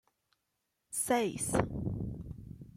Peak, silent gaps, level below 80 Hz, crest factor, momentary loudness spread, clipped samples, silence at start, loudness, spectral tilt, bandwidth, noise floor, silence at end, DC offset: -14 dBFS; none; -52 dBFS; 22 dB; 15 LU; under 0.1%; 0.9 s; -34 LUFS; -4.5 dB/octave; 16.5 kHz; -83 dBFS; 0.05 s; under 0.1%